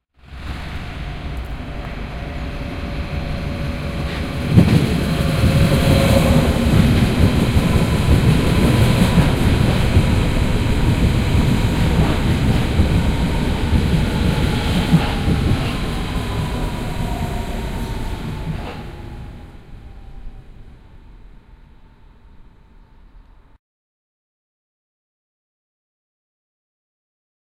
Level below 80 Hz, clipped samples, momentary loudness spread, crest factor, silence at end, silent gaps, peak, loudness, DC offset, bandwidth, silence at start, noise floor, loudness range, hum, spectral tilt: -24 dBFS; under 0.1%; 15 LU; 18 dB; 4.35 s; none; 0 dBFS; -18 LUFS; under 0.1%; 16 kHz; 0.3 s; -46 dBFS; 13 LU; none; -6.5 dB/octave